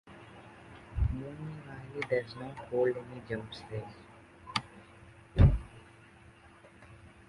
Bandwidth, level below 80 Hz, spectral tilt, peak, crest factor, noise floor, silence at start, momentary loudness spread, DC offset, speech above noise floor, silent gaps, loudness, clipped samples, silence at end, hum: 11.5 kHz; -40 dBFS; -7.5 dB/octave; -10 dBFS; 24 dB; -57 dBFS; 0.05 s; 28 LU; under 0.1%; 21 dB; none; -34 LUFS; under 0.1%; 0.2 s; none